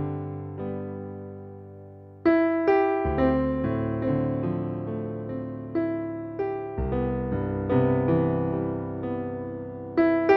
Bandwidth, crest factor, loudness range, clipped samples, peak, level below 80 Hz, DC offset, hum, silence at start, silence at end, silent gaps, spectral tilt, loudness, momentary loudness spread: 5.6 kHz; 18 dB; 5 LU; under 0.1%; -8 dBFS; -44 dBFS; under 0.1%; none; 0 s; 0 s; none; -10.5 dB/octave; -27 LUFS; 14 LU